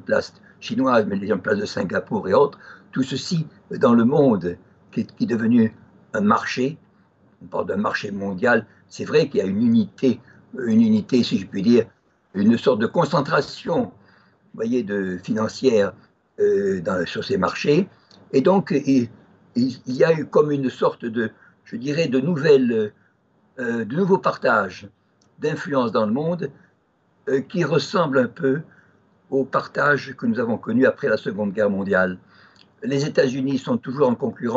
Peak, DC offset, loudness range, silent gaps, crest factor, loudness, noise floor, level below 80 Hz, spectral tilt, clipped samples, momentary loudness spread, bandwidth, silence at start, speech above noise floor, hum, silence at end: -4 dBFS; under 0.1%; 3 LU; none; 16 dB; -21 LUFS; -63 dBFS; -64 dBFS; -6.5 dB/octave; under 0.1%; 11 LU; 7.8 kHz; 0.1 s; 43 dB; none; 0 s